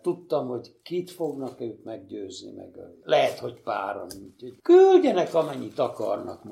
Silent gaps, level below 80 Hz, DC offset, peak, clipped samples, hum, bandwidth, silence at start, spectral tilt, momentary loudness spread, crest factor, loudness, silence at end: none; -72 dBFS; under 0.1%; -6 dBFS; under 0.1%; none; 13 kHz; 0.05 s; -6 dB/octave; 23 LU; 18 dB; -24 LUFS; 0 s